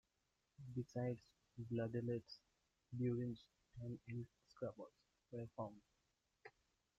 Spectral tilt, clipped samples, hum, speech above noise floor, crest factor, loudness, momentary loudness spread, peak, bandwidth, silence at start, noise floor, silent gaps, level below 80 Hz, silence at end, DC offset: -8.5 dB/octave; under 0.1%; none; 40 dB; 16 dB; -49 LUFS; 20 LU; -32 dBFS; 7.6 kHz; 0.6 s; -87 dBFS; none; -78 dBFS; 0.5 s; under 0.1%